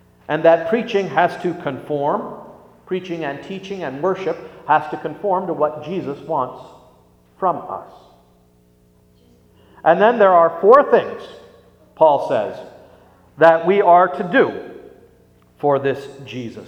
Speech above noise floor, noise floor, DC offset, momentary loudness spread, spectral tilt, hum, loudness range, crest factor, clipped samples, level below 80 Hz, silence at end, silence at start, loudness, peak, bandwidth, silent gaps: 37 dB; -54 dBFS; under 0.1%; 18 LU; -7 dB/octave; 60 Hz at -55 dBFS; 10 LU; 18 dB; under 0.1%; -62 dBFS; 0 s; 0.3 s; -17 LUFS; 0 dBFS; 8.4 kHz; none